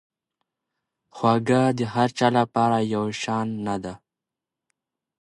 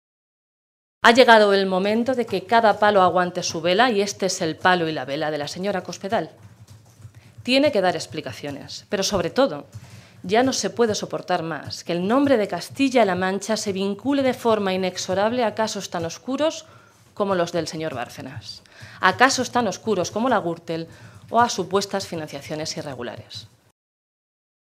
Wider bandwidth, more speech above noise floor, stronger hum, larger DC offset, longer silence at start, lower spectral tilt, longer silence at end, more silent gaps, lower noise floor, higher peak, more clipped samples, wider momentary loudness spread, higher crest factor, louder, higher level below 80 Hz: second, 11.5 kHz vs 15 kHz; first, 65 dB vs 26 dB; neither; neither; about the same, 1.15 s vs 1.05 s; first, -6 dB/octave vs -4 dB/octave; about the same, 1.25 s vs 1.25 s; neither; first, -88 dBFS vs -48 dBFS; second, -4 dBFS vs 0 dBFS; neither; second, 9 LU vs 15 LU; about the same, 20 dB vs 22 dB; about the same, -23 LUFS vs -21 LUFS; about the same, -62 dBFS vs -62 dBFS